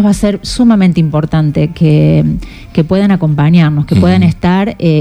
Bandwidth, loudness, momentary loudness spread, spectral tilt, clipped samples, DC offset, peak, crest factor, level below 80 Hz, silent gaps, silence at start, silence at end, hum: over 20 kHz; -10 LUFS; 5 LU; -7.5 dB/octave; 0.1%; under 0.1%; 0 dBFS; 10 dB; -30 dBFS; none; 0 s; 0 s; none